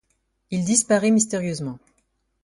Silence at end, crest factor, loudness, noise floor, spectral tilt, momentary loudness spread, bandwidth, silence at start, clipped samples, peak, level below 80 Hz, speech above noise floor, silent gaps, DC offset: 0.65 s; 18 dB; -21 LUFS; -70 dBFS; -4.5 dB/octave; 14 LU; 11.5 kHz; 0.5 s; under 0.1%; -6 dBFS; -60 dBFS; 49 dB; none; under 0.1%